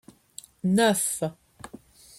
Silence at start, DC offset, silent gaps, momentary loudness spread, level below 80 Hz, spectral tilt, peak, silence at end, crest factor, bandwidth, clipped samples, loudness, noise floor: 0.65 s; under 0.1%; none; 24 LU; -64 dBFS; -4 dB/octave; -8 dBFS; 0.45 s; 20 dB; 16 kHz; under 0.1%; -25 LUFS; -49 dBFS